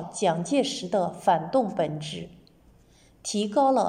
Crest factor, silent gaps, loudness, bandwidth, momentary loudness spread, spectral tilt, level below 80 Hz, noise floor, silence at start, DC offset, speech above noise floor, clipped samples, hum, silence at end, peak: 18 dB; none; -26 LUFS; 15 kHz; 13 LU; -5 dB/octave; -64 dBFS; -57 dBFS; 0 s; under 0.1%; 32 dB; under 0.1%; none; 0 s; -10 dBFS